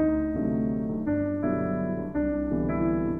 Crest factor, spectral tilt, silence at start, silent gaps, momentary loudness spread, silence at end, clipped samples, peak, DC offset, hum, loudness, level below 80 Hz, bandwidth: 12 dB; -12 dB/octave; 0 s; none; 3 LU; 0 s; under 0.1%; -14 dBFS; 0.2%; none; -28 LUFS; -42 dBFS; 2.7 kHz